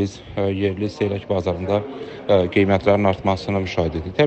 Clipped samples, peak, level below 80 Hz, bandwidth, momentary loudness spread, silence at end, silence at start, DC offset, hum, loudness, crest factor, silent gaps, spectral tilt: under 0.1%; -4 dBFS; -44 dBFS; 8.4 kHz; 8 LU; 0 s; 0 s; under 0.1%; none; -21 LUFS; 18 dB; none; -7.5 dB/octave